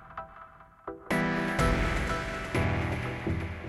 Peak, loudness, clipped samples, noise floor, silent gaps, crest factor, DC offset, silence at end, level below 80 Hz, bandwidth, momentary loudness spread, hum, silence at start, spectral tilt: -14 dBFS; -30 LUFS; under 0.1%; -52 dBFS; none; 18 dB; under 0.1%; 0 s; -38 dBFS; 14.5 kHz; 17 LU; none; 0 s; -6 dB/octave